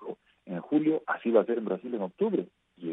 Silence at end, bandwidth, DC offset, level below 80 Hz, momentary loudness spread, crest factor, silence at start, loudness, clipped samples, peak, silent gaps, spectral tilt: 0 s; 3.9 kHz; under 0.1%; -82 dBFS; 16 LU; 20 dB; 0 s; -29 LUFS; under 0.1%; -10 dBFS; none; -10 dB/octave